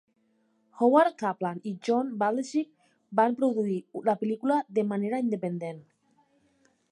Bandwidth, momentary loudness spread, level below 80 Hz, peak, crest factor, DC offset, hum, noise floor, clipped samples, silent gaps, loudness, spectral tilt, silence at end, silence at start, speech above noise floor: 11.5 kHz; 11 LU; -84 dBFS; -8 dBFS; 20 dB; under 0.1%; none; -70 dBFS; under 0.1%; none; -28 LUFS; -7 dB/octave; 1.1 s; 0.75 s; 43 dB